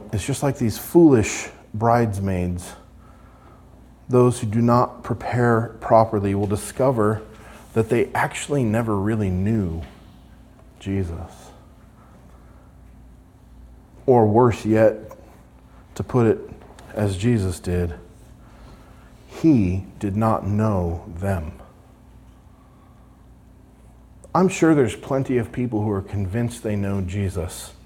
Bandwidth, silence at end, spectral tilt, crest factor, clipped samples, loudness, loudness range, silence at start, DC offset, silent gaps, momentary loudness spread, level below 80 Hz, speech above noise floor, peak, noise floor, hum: 17 kHz; 0.15 s; -7 dB/octave; 20 dB; under 0.1%; -21 LUFS; 9 LU; 0 s; under 0.1%; none; 15 LU; -46 dBFS; 29 dB; -2 dBFS; -49 dBFS; none